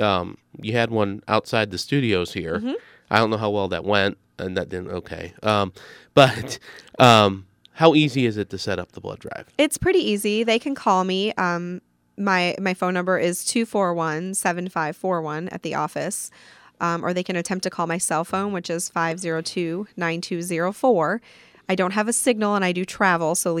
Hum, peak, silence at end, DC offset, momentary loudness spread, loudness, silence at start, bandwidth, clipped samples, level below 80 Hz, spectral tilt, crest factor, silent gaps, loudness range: none; 0 dBFS; 0 s; under 0.1%; 12 LU; -22 LUFS; 0 s; 17.5 kHz; under 0.1%; -56 dBFS; -4.5 dB/octave; 22 dB; none; 7 LU